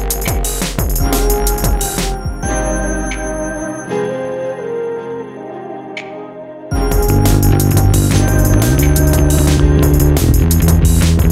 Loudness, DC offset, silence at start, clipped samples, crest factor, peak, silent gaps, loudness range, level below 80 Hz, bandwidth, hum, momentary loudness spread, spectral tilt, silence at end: -14 LUFS; under 0.1%; 0 s; under 0.1%; 12 dB; 0 dBFS; none; 10 LU; -18 dBFS; 16.5 kHz; none; 15 LU; -5.5 dB/octave; 0 s